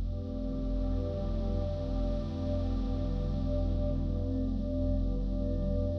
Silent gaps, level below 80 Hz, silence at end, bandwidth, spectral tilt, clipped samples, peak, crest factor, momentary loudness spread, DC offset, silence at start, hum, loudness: none; -34 dBFS; 0 s; 6 kHz; -10 dB/octave; under 0.1%; -20 dBFS; 10 dB; 2 LU; under 0.1%; 0 s; none; -34 LUFS